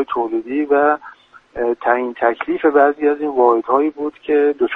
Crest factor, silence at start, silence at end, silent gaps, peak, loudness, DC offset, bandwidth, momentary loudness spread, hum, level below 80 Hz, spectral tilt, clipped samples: 16 dB; 0 s; 0 s; none; 0 dBFS; -17 LUFS; under 0.1%; 4 kHz; 8 LU; none; -56 dBFS; -7 dB/octave; under 0.1%